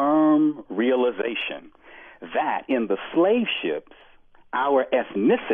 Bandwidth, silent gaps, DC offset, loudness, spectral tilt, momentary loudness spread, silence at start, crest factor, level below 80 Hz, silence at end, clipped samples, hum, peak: 3.7 kHz; none; under 0.1%; -23 LUFS; -9 dB/octave; 11 LU; 0 s; 14 dB; -64 dBFS; 0 s; under 0.1%; none; -10 dBFS